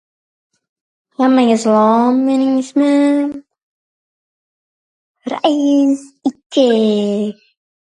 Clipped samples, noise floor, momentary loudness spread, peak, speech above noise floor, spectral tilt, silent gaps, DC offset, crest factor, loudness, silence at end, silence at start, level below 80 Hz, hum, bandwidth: under 0.1%; under -90 dBFS; 11 LU; 0 dBFS; over 77 dB; -5.5 dB/octave; 3.63-5.15 s, 6.46-6.50 s; under 0.1%; 16 dB; -14 LUFS; 0.6 s; 1.2 s; -68 dBFS; none; 10 kHz